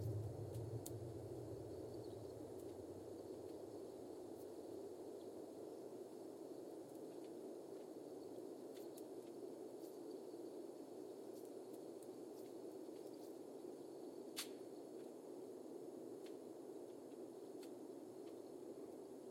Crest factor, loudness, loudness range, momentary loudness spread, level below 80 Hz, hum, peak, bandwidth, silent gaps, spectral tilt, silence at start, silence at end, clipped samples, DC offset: 20 dB; -54 LUFS; 2 LU; 5 LU; -78 dBFS; none; -32 dBFS; 16.5 kHz; none; -6 dB/octave; 0 s; 0 s; under 0.1%; under 0.1%